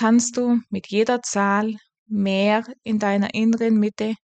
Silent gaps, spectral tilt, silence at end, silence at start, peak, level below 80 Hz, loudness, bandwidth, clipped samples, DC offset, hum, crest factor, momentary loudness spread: 1.99-2.06 s; -5 dB/octave; 0.15 s; 0 s; -8 dBFS; -64 dBFS; -21 LUFS; 9.2 kHz; under 0.1%; under 0.1%; none; 12 dB; 7 LU